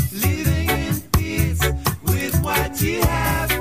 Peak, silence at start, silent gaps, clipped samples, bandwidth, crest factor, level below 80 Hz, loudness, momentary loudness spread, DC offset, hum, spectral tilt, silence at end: -4 dBFS; 0 s; none; under 0.1%; 16 kHz; 16 dB; -28 dBFS; -20 LUFS; 2 LU; 0.3%; none; -4.5 dB/octave; 0 s